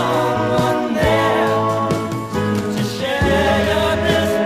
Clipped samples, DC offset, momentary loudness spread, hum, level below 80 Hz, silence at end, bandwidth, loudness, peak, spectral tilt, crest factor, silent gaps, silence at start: under 0.1%; under 0.1%; 5 LU; none; -34 dBFS; 0 s; 15.5 kHz; -17 LUFS; -4 dBFS; -5.5 dB/octave; 12 dB; none; 0 s